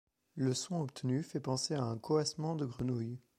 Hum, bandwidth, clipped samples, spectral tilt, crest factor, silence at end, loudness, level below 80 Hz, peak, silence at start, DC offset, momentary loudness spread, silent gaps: none; 14 kHz; under 0.1%; -5.5 dB/octave; 18 dB; 0.2 s; -36 LUFS; -68 dBFS; -18 dBFS; 0.35 s; under 0.1%; 4 LU; none